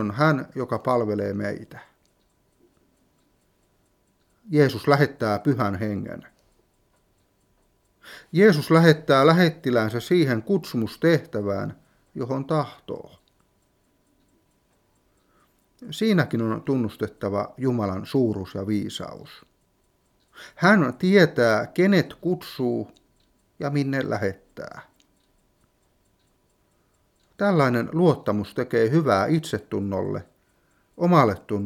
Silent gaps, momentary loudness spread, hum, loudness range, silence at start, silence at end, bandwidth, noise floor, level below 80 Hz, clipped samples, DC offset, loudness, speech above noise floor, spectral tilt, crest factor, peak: none; 17 LU; none; 11 LU; 0 s; 0 s; 15.5 kHz; -66 dBFS; -64 dBFS; under 0.1%; under 0.1%; -22 LUFS; 44 dB; -7 dB/octave; 24 dB; 0 dBFS